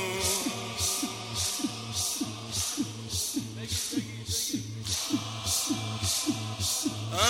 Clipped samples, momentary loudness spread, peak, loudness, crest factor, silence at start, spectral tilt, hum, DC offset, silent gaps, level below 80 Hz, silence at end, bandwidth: under 0.1%; 5 LU; -10 dBFS; -30 LUFS; 20 dB; 0 s; -2.5 dB/octave; none; under 0.1%; none; -56 dBFS; 0 s; 16 kHz